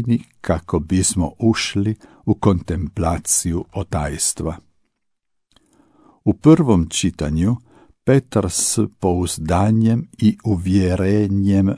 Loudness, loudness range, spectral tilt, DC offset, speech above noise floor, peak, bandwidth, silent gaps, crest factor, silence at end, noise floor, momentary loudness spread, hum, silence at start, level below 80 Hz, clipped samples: -19 LUFS; 5 LU; -5.5 dB/octave; under 0.1%; 53 dB; 0 dBFS; 11 kHz; none; 18 dB; 0 s; -71 dBFS; 8 LU; none; 0 s; -38 dBFS; under 0.1%